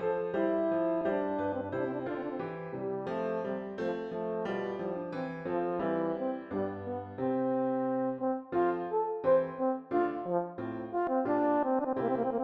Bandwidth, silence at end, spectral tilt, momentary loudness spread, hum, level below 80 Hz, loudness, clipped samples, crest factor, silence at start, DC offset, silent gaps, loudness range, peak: 5.8 kHz; 0 s; -9 dB/octave; 8 LU; none; -70 dBFS; -33 LUFS; under 0.1%; 16 dB; 0 s; under 0.1%; none; 5 LU; -16 dBFS